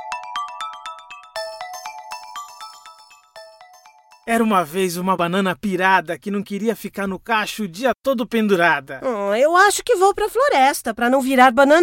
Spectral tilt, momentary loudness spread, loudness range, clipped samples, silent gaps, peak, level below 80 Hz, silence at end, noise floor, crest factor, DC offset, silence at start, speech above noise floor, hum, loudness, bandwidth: -4 dB/octave; 19 LU; 16 LU; under 0.1%; none; 0 dBFS; -56 dBFS; 0 s; -49 dBFS; 18 dB; under 0.1%; 0 s; 32 dB; none; -18 LUFS; 17 kHz